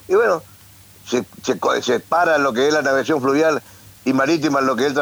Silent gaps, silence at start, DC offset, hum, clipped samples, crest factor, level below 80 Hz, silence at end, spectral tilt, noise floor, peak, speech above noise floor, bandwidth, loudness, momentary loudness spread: none; 0.1 s; under 0.1%; none; under 0.1%; 12 dB; -60 dBFS; 0 s; -4.5 dB/octave; -46 dBFS; -6 dBFS; 28 dB; over 20 kHz; -18 LUFS; 8 LU